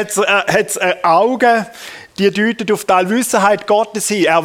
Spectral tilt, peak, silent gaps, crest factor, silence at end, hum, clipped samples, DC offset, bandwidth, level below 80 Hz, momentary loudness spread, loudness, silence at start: -3.5 dB/octave; 0 dBFS; none; 14 dB; 0 s; none; under 0.1%; under 0.1%; 17.5 kHz; -58 dBFS; 5 LU; -14 LUFS; 0 s